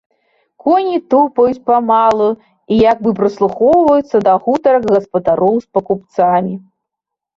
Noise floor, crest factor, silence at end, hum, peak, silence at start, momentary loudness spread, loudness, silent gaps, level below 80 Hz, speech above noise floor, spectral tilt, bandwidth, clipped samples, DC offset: -81 dBFS; 12 dB; 0.8 s; none; -2 dBFS; 0.65 s; 7 LU; -13 LUFS; none; -50 dBFS; 69 dB; -8 dB/octave; 7.6 kHz; under 0.1%; under 0.1%